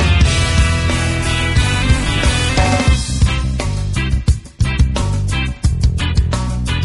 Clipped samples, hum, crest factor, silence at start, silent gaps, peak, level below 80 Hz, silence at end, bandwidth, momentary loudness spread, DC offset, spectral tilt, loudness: under 0.1%; none; 12 dB; 0 s; none; -2 dBFS; -18 dBFS; 0 s; 11.5 kHz; 6 LU; 0.2%; -4.5 dB/octave; -16 LUFS